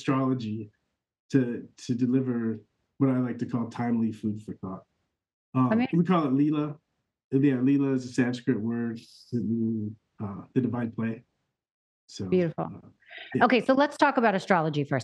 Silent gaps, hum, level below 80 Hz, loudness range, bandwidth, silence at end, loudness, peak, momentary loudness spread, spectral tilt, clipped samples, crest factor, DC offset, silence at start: 1.20-1.29 s, 5.33-5.53 s, 7.24-7.31 s, 11.71-12.07 s; none; -72 dBFS; 6 LU; 9.6 kHz; 0 s; -27 LUFS; -6 dBFS; 16 LU; -7.5 dB/octave; under 0.1%; 22 dB; under 0.1%; 0 s